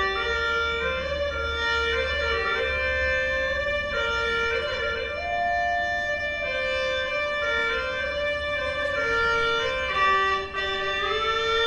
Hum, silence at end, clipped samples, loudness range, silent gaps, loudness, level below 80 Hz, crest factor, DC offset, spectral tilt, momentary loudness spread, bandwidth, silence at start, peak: none; 0 s; under 0.1%; 2 LU; none; -24 LUFS; -42 dBFS; 14 dB; under 0.1%; -3.5 dB/octave; 4 LU; 10.5 kHz; 0 s; -12 dBFS